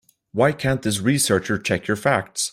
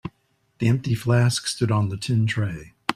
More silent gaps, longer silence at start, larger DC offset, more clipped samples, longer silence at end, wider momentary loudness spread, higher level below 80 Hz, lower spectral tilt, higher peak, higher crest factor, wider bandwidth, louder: neither; first, 0.35 s vs 0.05 s; neither; neither; about the same, 0 s vs 0.05 s; second, 4 LU vs 9 LU; about the same, -52 dBFS vs -54 dBFS; second, -4 dB/octave vs -5.5 dB/octave; about the same, -4 dBFS vs -4 dBFS; about the same, 18 dB vs 18 dB; first, 16 kHz vs 13.5 kHz; about the same, -21 LUFS vs -23 LUFS